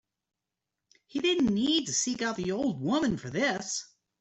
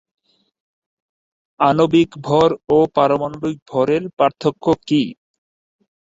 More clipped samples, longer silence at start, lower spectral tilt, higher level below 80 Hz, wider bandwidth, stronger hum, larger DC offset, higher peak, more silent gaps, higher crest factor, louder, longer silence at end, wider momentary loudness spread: neither; second, 1.15 s vs 1.6 s; second, -3.5 dB/octave vs -7 dB/octave; second, -62 dBFS vs -54 dBFS; about the same, 8.4 kHz vs 7.8 kHz; neither; neither; second, -14 dBFS vs -2 dBFS; second, none vs 3.62-3.66 s, 4.13-4.17 s; about the same, 16 dB vs 18 dB; second, -29 LUFS vs -17 LUFS; second, 0.35 s vs 0.9 s; about the same, 7 LU vs 7 LU